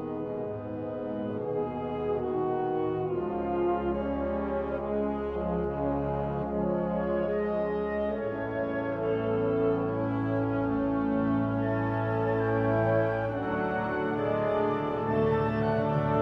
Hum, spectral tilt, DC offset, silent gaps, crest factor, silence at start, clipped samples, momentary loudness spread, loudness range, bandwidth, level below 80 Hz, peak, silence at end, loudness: none; -10 dB/octave; under 0.1%; none; 14 dB; 0 s; under 0.1%; 5 LU; 3 LU; 5.8 kHz; -48 dBFS; -14 dBFS; 0 s; -29 LUFS